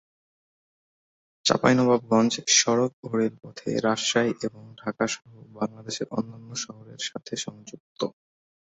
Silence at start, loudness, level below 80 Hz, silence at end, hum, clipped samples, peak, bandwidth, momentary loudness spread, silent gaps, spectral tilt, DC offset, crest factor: 1.45 s; -25 LUFS; -66 dBFS; 0.65 s; none; under 0.1%; -4 dBFS; 8.2 kHz; 15 LU; 2.93-3.03 s, 7.80-7.95 s; -3.5 dB/octave; under 0.1%; 24 dB